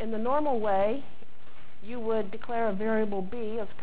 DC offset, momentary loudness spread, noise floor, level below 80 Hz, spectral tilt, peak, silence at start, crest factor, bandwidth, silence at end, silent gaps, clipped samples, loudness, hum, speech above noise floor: 4%; 9 LU; -56 dBFS; -58 dBFS; -10 dB/octave; -14 dBFS; 0 s; 14 dB; 4 kHz; 0 s; none; under 0.1%; -30 LUFS; none; 26 dB